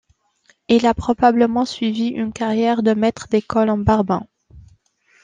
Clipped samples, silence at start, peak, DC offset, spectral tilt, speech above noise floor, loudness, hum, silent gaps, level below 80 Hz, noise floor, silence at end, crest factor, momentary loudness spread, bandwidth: under 0.1%; 0.7 s; -2 dBFS; under 0.1%; -6.5 dB/octave; 42 dB; -18 LUFS; none; none; -44 dBFS; -59 dBFS; 0.65 s; 16 dB; 6 LU; 9.4 kHz